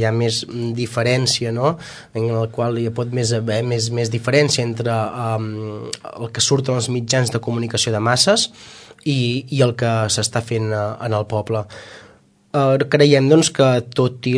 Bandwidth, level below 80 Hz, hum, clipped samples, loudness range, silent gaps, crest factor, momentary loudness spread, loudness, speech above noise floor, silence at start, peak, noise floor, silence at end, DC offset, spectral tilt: 11 kHz; -56 dBFS; none; under 0.1%; 3 LU; none; 18 dB; 11 LU; -18 LUFS; 32 dB; 0 s; 0 dBFS; -50 dBFS; 0 s; under 0.1%; -4.5 dB/octave